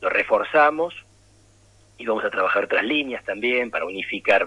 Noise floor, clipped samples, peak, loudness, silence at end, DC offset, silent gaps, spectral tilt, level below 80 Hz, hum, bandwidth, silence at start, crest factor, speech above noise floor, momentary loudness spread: -55 dBFS; under 0.1%; -6 dBFS; -22 LUFS; 0 s; under 0.1%; none; -4.5 dB/octave; -60 dBFS; none; 11 kHz; 0 s; 18 dB; 33 dB; 10 LU